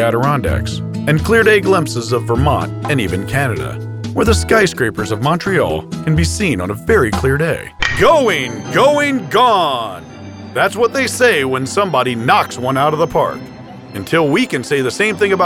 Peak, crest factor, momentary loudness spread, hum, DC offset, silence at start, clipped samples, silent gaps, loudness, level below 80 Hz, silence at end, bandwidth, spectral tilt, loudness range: 0 dBFS; 14 dB; 10 LU; none; under 0.1%; 0 s; under 0.1%; none; -15 LUFS; -32 dBFS; 0 s; 18 kHz; -5 dB/octave; 2 LU